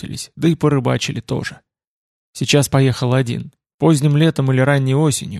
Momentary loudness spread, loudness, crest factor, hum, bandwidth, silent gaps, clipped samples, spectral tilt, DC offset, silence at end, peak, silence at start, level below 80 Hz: 12 LU; -16 LUFS; 16 dB; none; 13 kHz; 1.87-2.33 s, 3.74-3.79 s; under 0.1%; -5.5 dB/octave; under 0.1%; 0 s; -2 dBFS; 0 s; -50 dBFS